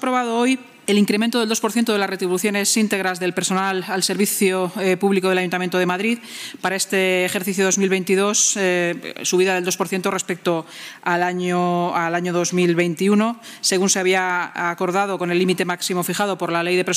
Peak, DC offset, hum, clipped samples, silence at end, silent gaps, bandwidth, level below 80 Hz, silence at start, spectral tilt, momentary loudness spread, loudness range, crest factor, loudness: -6 dBFS; under 0.1%; none; under 0.1%; 0 s; none; 16 kHz; -76 dBFS; 0 s; -3.5 dB/octave; 5 LU; 2 LU; 14 dB; -19 LUFS